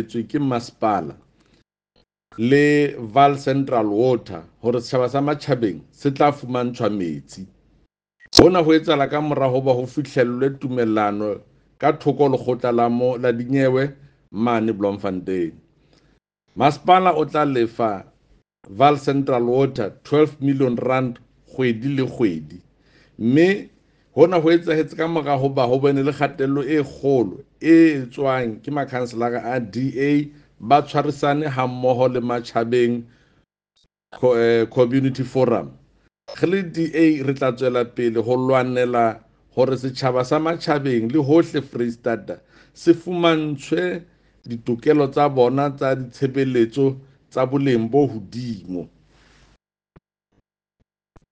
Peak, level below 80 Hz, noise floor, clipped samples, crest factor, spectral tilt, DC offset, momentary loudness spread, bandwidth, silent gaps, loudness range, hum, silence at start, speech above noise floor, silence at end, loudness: 0 dBFS; -54 dBFS; -71 dBFS; under 0.1%; 20 dB; -6.5 dB/octave; under 0.1%; 10 LU; 9.4 kHz; none; 4 LU; none; 0 s; 52 dB; 2.45 s; -20 LUFS